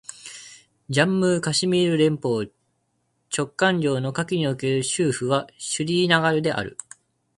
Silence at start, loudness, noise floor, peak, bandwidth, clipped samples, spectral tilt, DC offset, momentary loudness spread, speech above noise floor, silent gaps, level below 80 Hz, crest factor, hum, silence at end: 0.1 s; -22 LUFS; -71 dBFS; -4 dBFS; 11.5 kHz; under 0.1%; -4.5 dB/octave; under 0.1%; 15 LU; 49 dB; none; -60 dBFS; 20 dB; none; 0.65 s